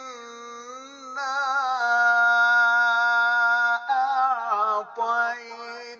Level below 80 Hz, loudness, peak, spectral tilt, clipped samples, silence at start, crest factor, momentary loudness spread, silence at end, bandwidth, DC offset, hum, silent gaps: -82 dBFS; -21 LUFS; -10 dBFS; 0.5 dB/octave; under 0.1%; 0 s; 12 dB; 21 LU; 0.05 s; 7.4 kHz; under 0.1%; none; none